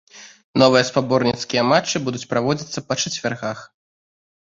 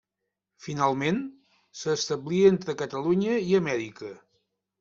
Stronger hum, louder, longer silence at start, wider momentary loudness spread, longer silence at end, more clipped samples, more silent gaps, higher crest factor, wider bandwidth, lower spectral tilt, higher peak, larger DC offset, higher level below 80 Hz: neither; first, -20 LUFS vs -26 LUFS; second, 0.15 s vs 0.6 s; second, 11 LU vs 20 LU; first, 0.95 s vs 0.65 s; neither; first, 0.44-0.54 s vs none; about the same, 20 dB vs 20 dB; about the same, 7.8 kHz vs 7.6 kHz; second, -4 dB/octave vs -5.5 dB/octave; first, 0 dBFS vs -8 dBFS; neither; first, -58 dBFS vs -66 dBFS